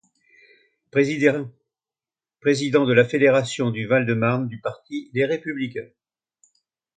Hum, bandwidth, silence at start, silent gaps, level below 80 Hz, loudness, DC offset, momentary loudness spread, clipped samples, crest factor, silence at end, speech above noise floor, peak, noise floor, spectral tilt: none; 9.4 kHz; 0.95 s; none; -66 dBFS; -21 LUFS; under 0.1%; 13 LU; under 0.1%; 22 dB; 1.1 s; over 69 dB; -2 dBFS; under -90 dBFS; -6 dB/octave